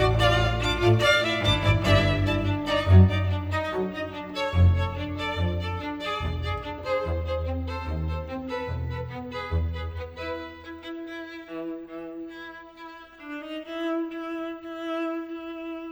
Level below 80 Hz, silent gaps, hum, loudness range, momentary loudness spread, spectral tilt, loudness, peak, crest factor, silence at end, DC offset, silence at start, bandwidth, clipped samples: -38 dBFS; none; none; 14 LU; 17 LU; -6.5 dB/octave; -26 LUFS; -6 dBFS; 20 dB; 0 s; under 0.1%; 0 s; 11.5 kHz; under 0.1%